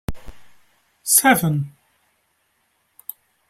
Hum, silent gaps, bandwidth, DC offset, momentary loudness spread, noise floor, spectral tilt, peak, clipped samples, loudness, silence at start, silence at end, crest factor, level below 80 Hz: none; none; 16 kHz; under 0.1%; 23 LU; -67 dBFS; -3.5 dB/octave; 0 dBFS; under 0.1%; -17 LUFS; 0.1 s; 1.8 s; 24 dB; -44 dBFS